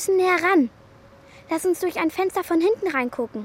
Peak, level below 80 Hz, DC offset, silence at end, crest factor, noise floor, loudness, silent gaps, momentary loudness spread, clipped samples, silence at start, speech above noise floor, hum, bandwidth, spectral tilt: -8 dBFS; -60 dBFS; under 0.1%; 0 s; 16 dB; -49 dBFS; -22 LUFS; none; 8 LU; under 0.1%; 0 s; 28 dB; none; 16.5 kHz; -4 dB/octave